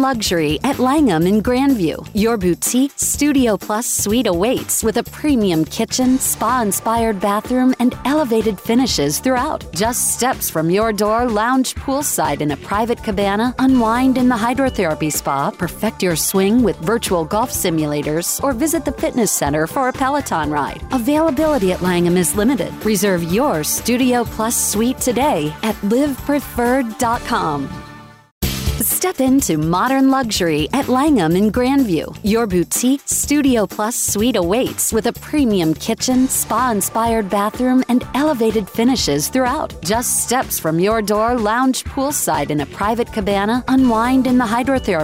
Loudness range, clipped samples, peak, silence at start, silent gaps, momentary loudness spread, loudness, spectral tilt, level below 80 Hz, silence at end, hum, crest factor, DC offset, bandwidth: 2 LU; under 0.1%; -6 dBFS; 0 s; 28.31-28.41 s; 5 LU; -17 LUFS; -4 dB/octave; -36 dBFS; 0 s; none; 10 dB; under 0.1%; 16.5 kHz